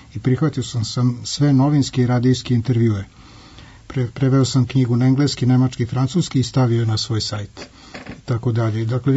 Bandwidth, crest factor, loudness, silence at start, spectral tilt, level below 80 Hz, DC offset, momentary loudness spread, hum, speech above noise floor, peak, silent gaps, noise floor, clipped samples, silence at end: 8 kHz; 12 dB; -19 LUFS; 0.15 s; -6.5 dB/octave; -48 dBFS; under 0.1%; 12 LU; none; 24 dB; -6 dBFS; none; -42 dBFS; under 0.1%; 0 s